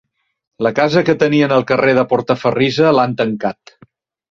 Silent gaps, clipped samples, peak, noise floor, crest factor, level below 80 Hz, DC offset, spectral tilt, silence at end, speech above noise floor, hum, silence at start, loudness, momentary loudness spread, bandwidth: none; under 0.1%; 0 dBFS; -50 dBFS; 16 dB; -54 dBFS; under 0.1%; -6.5 dB/octave; 0.8 s; 36 dB; none; 0.6 s; -14 LUFS; 6 LU; 7.4 kHz